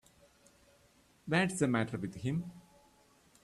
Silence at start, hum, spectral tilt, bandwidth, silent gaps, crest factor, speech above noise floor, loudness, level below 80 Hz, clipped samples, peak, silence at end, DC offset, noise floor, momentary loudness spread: 1.25 s; none; -5.5 dB/octave; 13.5 kHz; none; 22 dB; 34 dB; -34 LUFS; -68 dBFS; under 0.1%; -16 dBFS; 0.85 s; under 0.1%; -67 dBFS; 14 LU